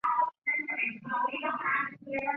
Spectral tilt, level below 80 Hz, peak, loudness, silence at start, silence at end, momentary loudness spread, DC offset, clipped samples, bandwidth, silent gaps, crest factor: -1.5 dB/octave; -74 dBFS; -18 dBFS; -31 LUFS; 0.05 s; 0 s; 3 LU; under 0.1%; under 0.1%; 5.6 kHz; 0.38-0.42 s; 14 dB